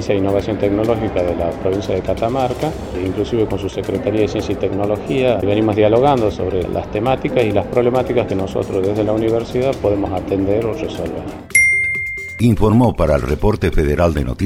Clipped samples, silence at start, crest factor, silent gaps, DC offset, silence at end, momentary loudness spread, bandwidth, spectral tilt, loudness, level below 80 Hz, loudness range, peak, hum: under 0.1%; 0 s; 16 dB; none; under 0.1%; 0 s; 8 LU; 16 kHz; -6.5 dB/octave; -17 LUFS; -30 dBFS; 4 LU; 0 dBFS; none